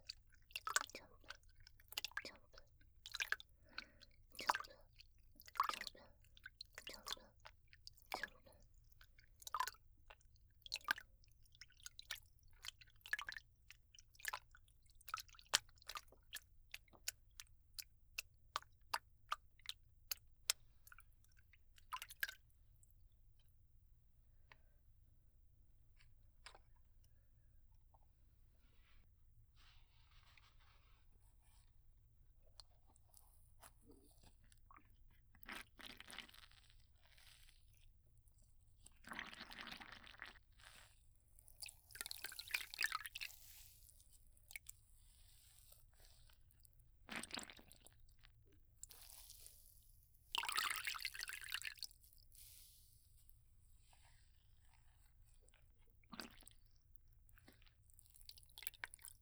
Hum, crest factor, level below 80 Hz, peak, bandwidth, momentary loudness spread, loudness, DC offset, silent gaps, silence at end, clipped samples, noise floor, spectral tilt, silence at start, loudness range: none; 44 dB; -70 dBFS; -10 dBFS; over 20 kHz; 25 LU; -48 LUFS; under 0.1%; none; 0 s; under 0.1%; -70 dBFS; 0 dB/octave; 0 s; 21 LU